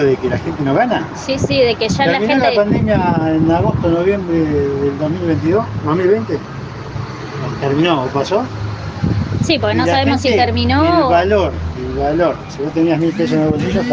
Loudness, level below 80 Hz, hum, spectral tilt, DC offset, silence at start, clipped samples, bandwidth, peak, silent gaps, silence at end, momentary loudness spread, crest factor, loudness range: -15 LUFS; -38 dBFS; none; -6.5 dB/octave; under 0.1%; 0 s; under 0.1%; 7.8 kHz; 0 dBFS; none; 0 s; 10 LU; 14 dB; 4 LU